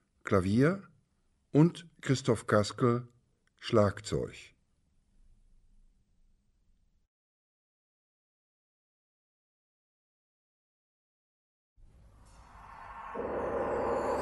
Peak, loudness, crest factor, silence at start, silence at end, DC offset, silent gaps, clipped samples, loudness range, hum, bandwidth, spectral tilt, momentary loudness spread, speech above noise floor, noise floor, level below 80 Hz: -12 dBFS; -30 LUFS; 24 dB; 0.25 s; 0 s; under 0.1%; 7.07-11.76 s; under 0.1%; 15 LU; none; 11.5 kHz; -6.5 dB/octave; 16 LU; 44 dB; -73 dBFS; -60 dBFS